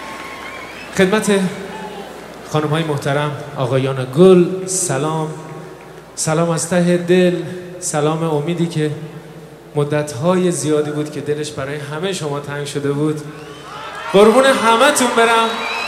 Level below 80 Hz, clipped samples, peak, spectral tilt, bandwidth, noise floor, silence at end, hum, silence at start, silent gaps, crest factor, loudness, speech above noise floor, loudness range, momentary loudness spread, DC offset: -54 dBFS; under 0.1%; 0 dBFS; -5 dB/octave; 15 kHz; -36 dBFS; 0 s; none; 0 s; none; 16 dB; -16 LUFS; 21 dB; 5 LU; 19 LU; under 0.1%